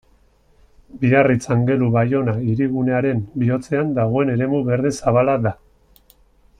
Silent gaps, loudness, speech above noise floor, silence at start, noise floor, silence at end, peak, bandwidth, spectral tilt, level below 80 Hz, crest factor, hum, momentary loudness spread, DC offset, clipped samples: none; -19 LUFS; 38 dB; 0.95 s; -55 dBFS; 1.05 s; -4 dBFS; 10.5 kHz; -8 dB/octave; -50 dBFS; 16 dB; none; 5 LU; under 0.1%; under 0.1%